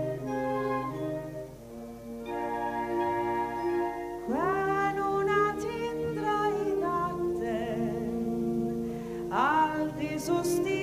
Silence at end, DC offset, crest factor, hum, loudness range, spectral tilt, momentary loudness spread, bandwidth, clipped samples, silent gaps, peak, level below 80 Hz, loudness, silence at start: 0 s; under 0.1%; 18 dB; none; 4 LU; -6 dB/octave; 10 LU; 15.5 kHz; under 0.1%; none; -12 dBFS; -54 dBFS; -30 LUFS; 0 s